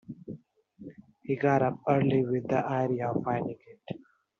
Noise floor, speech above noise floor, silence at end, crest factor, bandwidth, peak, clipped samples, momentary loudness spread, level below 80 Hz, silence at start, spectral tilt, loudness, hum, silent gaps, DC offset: -53 dBFS; 26 dB; 0.4 s; 20 dB; 7 kHz; -10 dBFS; under 0.1%; 22 LU; -68 dBFS; 0.1 s; -7.5 dB/octave; -28 LUFS; none; none; under 0.1%